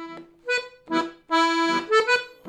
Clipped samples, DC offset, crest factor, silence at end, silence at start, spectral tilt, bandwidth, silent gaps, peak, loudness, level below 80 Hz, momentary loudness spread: under 0.1%; under 0.1%; 14 dB; 0 s; 0 s; -2.5 dB/octave; 13.5 kHz; none; -10 dBFS; -23 LUFS; -70 dBFS; 8 LU